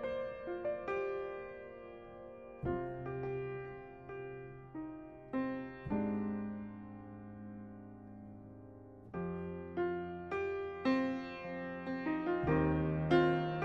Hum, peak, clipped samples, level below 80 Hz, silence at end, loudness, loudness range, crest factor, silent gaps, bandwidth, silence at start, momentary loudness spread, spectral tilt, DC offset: none; -18 dBFS; under 0.1%; -58 dBFS; 0 s; -38 LUFS; 8 LU; 20 dB; none; 7 kHz; 0 s; 19 LU; -9 dB/octave; under 0.1%